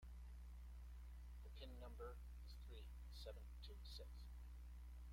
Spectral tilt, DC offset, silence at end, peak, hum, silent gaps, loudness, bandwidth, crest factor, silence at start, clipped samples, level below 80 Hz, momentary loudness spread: -5.5 dB/octave; under 0.1%; 0 s; -44 dBFS; 60 Hz at -55 dBFS; none; -59 LUFS; 16.5 kHz; 14 dB; 0 s; under 0.1%; -56 dBFS; 3 LU